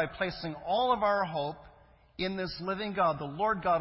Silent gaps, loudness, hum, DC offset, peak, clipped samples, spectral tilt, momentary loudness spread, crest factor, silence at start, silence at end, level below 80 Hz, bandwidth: none; -31 LUFS; none; under 0.1%; -14 dBFS; under 0.1%; -9 dB/octave; 11 LU; 16 dB; 0 s; 0 s; -58 dBFS; 5.8 kHz